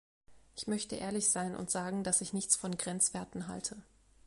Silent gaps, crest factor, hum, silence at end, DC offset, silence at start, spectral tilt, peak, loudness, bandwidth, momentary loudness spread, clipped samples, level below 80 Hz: none; 26 dB; none; 0.45 s; under 0.1%; 0.3 s; -3 dB/octave; -12 dBFS; -34 LUFS; 11.5 kHz; 11 LU; under 0.1%; -66 dBFS